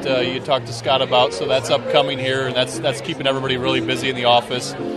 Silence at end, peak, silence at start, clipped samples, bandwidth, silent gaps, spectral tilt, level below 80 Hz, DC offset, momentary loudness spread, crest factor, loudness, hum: 0 s; 0 dBFS; 0 s; under 0.1%; 13 kHz; none; -4 dB/octave; -54 dBFS; under 0.1%; 5 LU; 20 dB; -19 LUFS; none